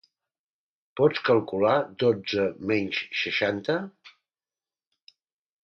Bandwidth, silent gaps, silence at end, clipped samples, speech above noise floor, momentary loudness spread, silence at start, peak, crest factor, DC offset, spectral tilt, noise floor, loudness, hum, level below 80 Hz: 6.6 kHz; none; 1.55 s; under 0.1%; over 65 dB; 6 LU; 0.95 s; -8 dBFS; 20 dB; under 0.1%; -6 dB/octave; under -90 dBFS; -25 LUFS; none; -66 dBFS